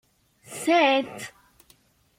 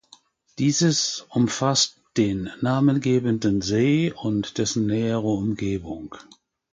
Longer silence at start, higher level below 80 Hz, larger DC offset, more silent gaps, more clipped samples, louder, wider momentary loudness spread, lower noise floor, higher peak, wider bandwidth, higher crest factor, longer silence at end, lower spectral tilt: about the same, 0.5 s vs 0.6 s; second, -72 dBFS vs -52 dBFS; neither; neither; neither; about the same, -22 LUFS vs -23 LUFS; first, 21 LU vs 7 LU; first, -61 dBFS vs -55 dBFS; about the same, -8 dBFS vs -6 dBFS; first, 16.5 kHz vs 9.6 kHz; about the same, 18 dB vs 16 dB; first, 0.9 s vs 0.5 s; second, -2.5 dB/octave vs -5 dB/octave